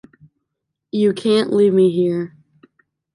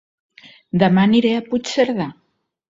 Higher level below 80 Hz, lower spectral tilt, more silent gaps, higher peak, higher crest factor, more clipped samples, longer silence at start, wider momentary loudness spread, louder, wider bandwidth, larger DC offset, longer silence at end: second, -66 dBFS vs -56 dBFS; about the same, -7 dB/octave vs -6.5 dB/octave; neither; second, -6 dBFS vs 0 dBFS; about the same, 14 dB vs 18 dB; neither; first, 0.95 s vs 0.75 s; about the same, 12 LU vs 11 LU; about the same, -17 LUFS vs -17 LUFS; first, 11 kHz vs 7.8 kHz; neither; first, 0.85 s vs 0.6 s